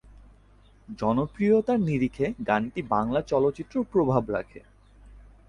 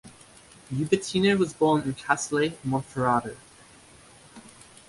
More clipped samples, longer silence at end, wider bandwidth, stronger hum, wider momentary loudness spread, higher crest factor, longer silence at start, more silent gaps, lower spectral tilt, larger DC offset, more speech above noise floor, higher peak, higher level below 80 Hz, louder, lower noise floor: neither; about the same, 0.3 s vs 0.4 s; second, 10 kHz vs 11.5 kHz; neither; second, 8 LU vs 12 LU; about the same, 18 dB vs 22 dB; first, 0.9 s vs 0.05 s; neither; first, -8.5 dB/octave vs -5 dB/octave; neither; first, 31 dB vs 27 dB; about the same, -8 dBFS vs -6 dBFS; first, -52 dBFS vs -60 dBFS; about the same, -26 LUFS vs -25 LUFS; first, -56 dBFS vs -52 dBFS